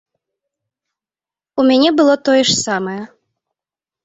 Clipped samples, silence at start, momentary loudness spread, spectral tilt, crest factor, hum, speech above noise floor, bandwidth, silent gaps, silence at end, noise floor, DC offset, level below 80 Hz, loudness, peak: under 0.1%; 1.55 s; 14 LU; -3.5 dB/octave; 18 dB; none; over 77 dB; 8.2 kHz; none; 1 s; under -90 dBFS; under 0.1%; -60 dBFS; -13 LUFS; 0 dBFS